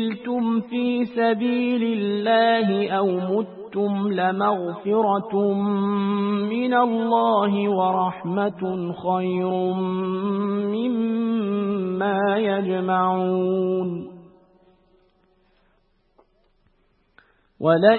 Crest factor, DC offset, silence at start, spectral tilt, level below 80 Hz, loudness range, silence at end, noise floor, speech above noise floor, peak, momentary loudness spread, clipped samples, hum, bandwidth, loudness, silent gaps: 20 dB; under 0.1%; 0 s; -11.5 dB/octave; -68 dBFS; 5 LU; 0 s; -64 dBFS; 43 dB; -2 dBFS; 5 LU; under 0.1%; none; 4.4 kHz; -22 LUFS; none